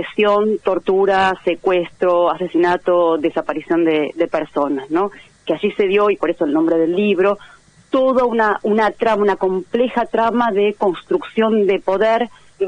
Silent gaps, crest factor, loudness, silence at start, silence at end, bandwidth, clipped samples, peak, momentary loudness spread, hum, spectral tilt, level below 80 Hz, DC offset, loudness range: none; 14 dB; -17 LUFS; 0 s; 0 s; 9.6 kHz; under 0.1%; -2 dBFS; 5 LU; none; -6.5 dB/octave; -54 dBFS; under 0.1%; 2 LU